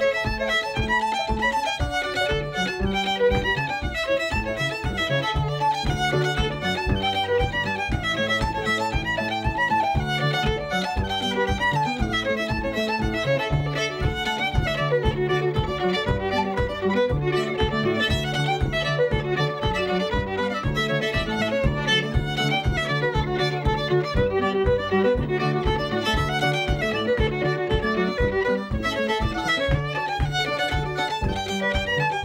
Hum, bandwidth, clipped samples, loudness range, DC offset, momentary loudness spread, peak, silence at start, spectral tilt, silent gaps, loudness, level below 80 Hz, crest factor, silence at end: none; 16 kHz; under 0.1%; 1 LU; under 0.1%; 3 LU; -8 dBFS; 0 s; -5.5 dB/octave; none; -23 LUFS; -34 dBFS; 14 dB; 0 s